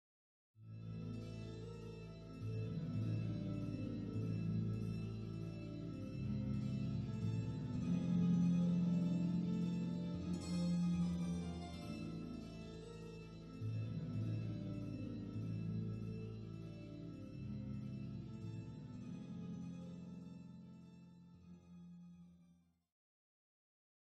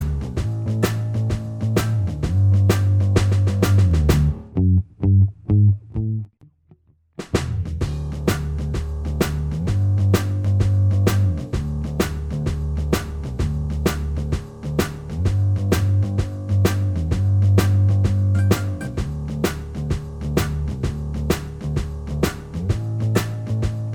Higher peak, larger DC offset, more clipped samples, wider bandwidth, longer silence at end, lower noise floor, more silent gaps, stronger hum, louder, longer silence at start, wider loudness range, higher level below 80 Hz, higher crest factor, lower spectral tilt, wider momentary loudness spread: second, -26 dBFS vs 0 dBFS; neither; neither; second, 9.2 kHz vs 18.5 kHz; first, 1.6 s vs 0 s; first, -71 dBFS vs -55 dBFS; neither; neither; second, -43 LUFS vs -21 LUFS; first, 0.55 s vs 0 s; first, 15 LU vs 7 LU; second, -62 dBFS vs -30 dBFS; about the same, 16 dB vs 20 dB; first, -8.5 dB/octave vs -7 dB/octave; first, 16 LU vs 9 LU